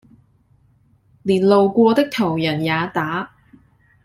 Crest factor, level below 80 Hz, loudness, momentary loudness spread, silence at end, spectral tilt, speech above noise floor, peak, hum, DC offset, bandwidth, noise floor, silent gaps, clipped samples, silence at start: 18 dB; -58 dBFS; -18 LUFS; 12 LU; 0.8 s; -7 dB/octave; 40 dB; -2 dBFS; none; under 0.1%; 14.5 kHz; -57 dBFS; none; under 0.1%; 1.25 s